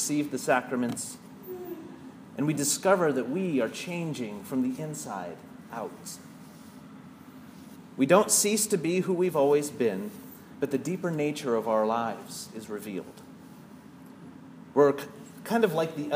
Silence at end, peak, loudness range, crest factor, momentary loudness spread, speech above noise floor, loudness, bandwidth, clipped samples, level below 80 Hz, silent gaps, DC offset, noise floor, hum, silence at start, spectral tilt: 0 s; -6 dBFS; 10 LU; 22 dB; 24 LU; 21 dB; -28 LUFS; 15.5 kHz; under 0.1%; -74 dBFS; none; under 0.1%; -48 dBFS; none; 0 s; -4 dB/octave